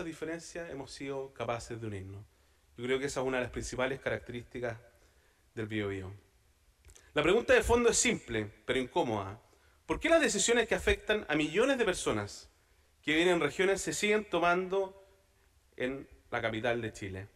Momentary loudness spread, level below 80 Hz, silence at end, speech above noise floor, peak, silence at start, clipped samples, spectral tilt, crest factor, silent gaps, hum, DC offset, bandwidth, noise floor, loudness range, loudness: 16 LU; -52 dBFS; 0.1 s; 35 dB; -14 dBFS; 0 s; under 0.1%; -3.5 dB/octave; 20 dB; none; none; under 0.1%; 15 kHz; -67 dBFS; 8 LU; -32 LUFS